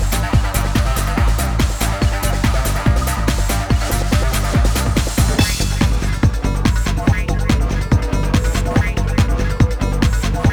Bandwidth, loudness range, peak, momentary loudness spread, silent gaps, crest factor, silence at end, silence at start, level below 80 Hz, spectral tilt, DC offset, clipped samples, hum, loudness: over 20 kHz; 1 LU; -2 dBFS; 2 LU; none; 14 dB; 0 s; 0 s; -18 dBFS; -5 dB/octave; under 0.1%; under 0.1%; none; -17 LUFS